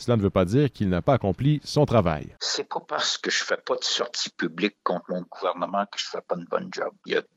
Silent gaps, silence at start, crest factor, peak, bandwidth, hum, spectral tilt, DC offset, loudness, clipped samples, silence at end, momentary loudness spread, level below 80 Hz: none; 0 s; 18 dB; -6 dBFS; 12 kHz; none; -5 dB/octave; under 0.1%; -25 LUFS; under 0.1%; 0.15 s; 8 LU; -50 dBFS